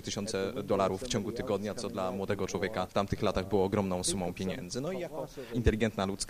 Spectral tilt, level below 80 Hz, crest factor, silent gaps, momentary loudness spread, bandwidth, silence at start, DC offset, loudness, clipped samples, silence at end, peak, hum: -5 dB/octave; -48 dBFS; 22 dB; none; 7 LU; 15.5 kHz; 0 s; under 0.1%; -33 LUFS; under 0.1%; 0 s; -10 dBFS; none